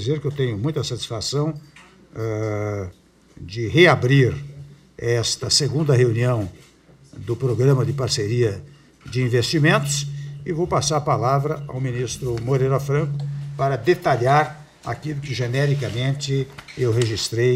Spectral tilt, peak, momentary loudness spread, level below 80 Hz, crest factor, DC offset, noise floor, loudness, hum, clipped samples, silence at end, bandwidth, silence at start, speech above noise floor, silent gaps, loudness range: -5 dB/octave; 0 dBFS; 13 LU; -50 dBFS; 22 dB; under 0.1%; -49 dBFS; -21 LUFS; none; under 0.1%; 0 s; 15 kHz; 0 s; 29 dB; none; 4 LU